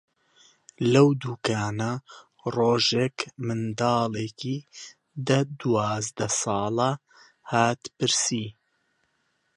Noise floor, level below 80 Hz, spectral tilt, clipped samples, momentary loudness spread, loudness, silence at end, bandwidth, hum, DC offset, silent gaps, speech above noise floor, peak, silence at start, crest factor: -72 dBFS; -62 dBFS; -4.5 dB/octave; under 0.1%; 13 LU; -25 LUFS; 1.05 s; 11.5 kHz; none; under 0.1%; none; 47 dB; -6 dBFS; 0.8 s; 20 dB